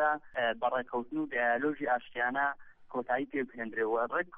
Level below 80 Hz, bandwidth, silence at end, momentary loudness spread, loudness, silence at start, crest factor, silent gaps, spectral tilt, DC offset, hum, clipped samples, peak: -68 dBFS; 3.8 kHz; 0 s; 6 LU; -33 LUFS; 0 s; 16 dB; none; -7.5 dB/octave; under 0.1%; none; under 0.1%; -16 dBFS